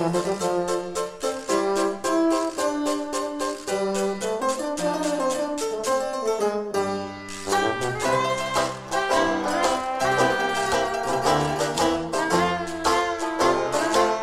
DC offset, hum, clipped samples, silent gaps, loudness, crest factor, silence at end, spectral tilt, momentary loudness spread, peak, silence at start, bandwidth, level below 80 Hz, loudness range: under 0.1%; none; under 0.1%; none; -24 LUFS; 18 dB; 0 s; -3.5 dB/octave; 5 LU; -6 dBFS; 0 s; 15.5 kHz; -52 dBFS; 3 LU